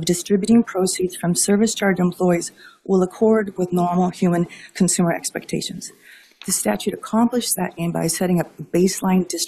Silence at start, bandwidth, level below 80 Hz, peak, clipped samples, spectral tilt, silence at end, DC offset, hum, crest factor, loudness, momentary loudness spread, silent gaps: 0 s; 14.5 kHz; -56 dBFS; -6 dBFS; under 0.1%; -5 dB/octave; 0 s; under 0.1%; none; 14 dB; -20 LUFS; 9 LU; none